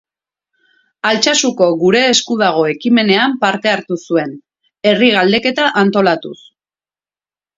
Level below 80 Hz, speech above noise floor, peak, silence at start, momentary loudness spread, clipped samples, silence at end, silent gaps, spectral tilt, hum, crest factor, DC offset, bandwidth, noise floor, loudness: -60 dBFS; over 77 dB; 0 dBFS; 1.05 s; 7 LU; under 0.1%; 1.2 s; none; -3.5 dB/octave; none; 14 dB; under 0.1%; 7.8 kHz; under -90 dBFS; -13 LUFS